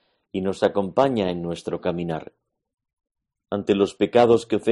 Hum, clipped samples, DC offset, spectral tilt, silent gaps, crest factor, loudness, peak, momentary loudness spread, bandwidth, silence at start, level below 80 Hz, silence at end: none; under 0.1%; under 0.1%; -6.5 dB/octave; 2.93-2.97 s; 20 dB; -22 LUFS; -4 dBFS; 12 LU; 11.5 kHz; 0.35 s; -58 dBFS; 0 s